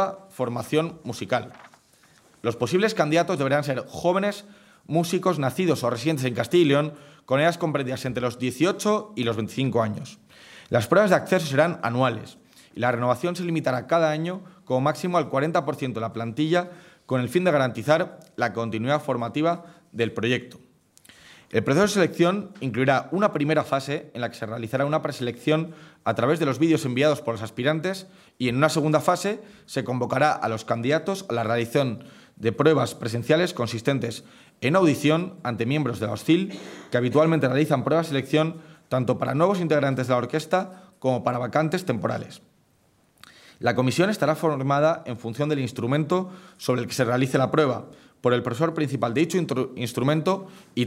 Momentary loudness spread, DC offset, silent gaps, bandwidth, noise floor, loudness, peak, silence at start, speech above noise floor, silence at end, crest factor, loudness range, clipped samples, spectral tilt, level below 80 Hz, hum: 9 LU; under 0.1%; none; 16 kHz; -63 dBFS; -24 LUFS; -4 dBFS; 0 s; 39 dB; 0 s; 20 dB; 3 LU; under 0.1%; -6 dB/octave; -66 dBFS; none